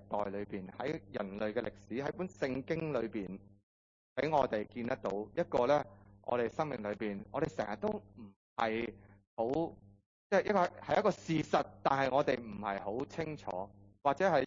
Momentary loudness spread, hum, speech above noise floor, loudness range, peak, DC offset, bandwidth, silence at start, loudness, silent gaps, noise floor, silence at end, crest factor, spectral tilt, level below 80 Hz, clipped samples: 12 LU; none; over 55 dB; 5 LU; -16 dBFS; under 0.1%; 7.4 kHz; 0 s; -36 LUFS; 3.63-4.16 s, 8.36-8.56 s, 9.27-9.37 s, 10.06-10.30 s; under -90 dBFS; 0 s; 20 dB; -5 dB/octave; -64 dBFS; under 0.1%